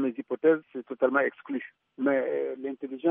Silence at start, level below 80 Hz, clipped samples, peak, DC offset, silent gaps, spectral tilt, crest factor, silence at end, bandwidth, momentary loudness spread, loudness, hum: 0 s; -82 dBFS; under 0.1%; -12 dBFS; under 0.1%; none; -4.5 dB/octave; 18 dB; 0 s; 3.7 kHz; 11 LU; -28 LUFS; none